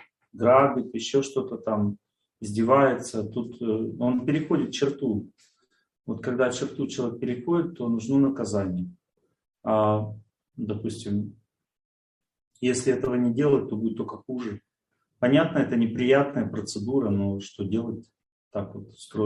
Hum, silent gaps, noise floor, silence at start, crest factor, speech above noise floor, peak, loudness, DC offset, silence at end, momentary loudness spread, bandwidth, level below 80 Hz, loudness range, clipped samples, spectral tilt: none; 11.85-12.21 s, 12.47-12.51 s, 18.32-18.51 s; -79 dBFS; 0.35 s; 20 dB; 54 dB; -6 dBFS; -26 LUFS; under 0.1%; 0 s; 14 LU; 11.5 kHz; -64 dBFS; 5 LU; under 0.1%; -6 dB/octave